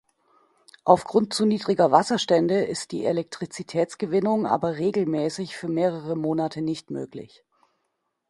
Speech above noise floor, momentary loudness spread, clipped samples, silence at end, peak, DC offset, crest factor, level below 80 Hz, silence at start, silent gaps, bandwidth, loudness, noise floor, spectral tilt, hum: 53 dB; 12 LU; under 0.1%; 1.05 s; -2 dBFS; under 0.1%; 22 dB; -64 dBFS; 0.85 s; none; 11.5 kHz; -24 LUFS; -77 dBFS; -5.5 dB/octave; none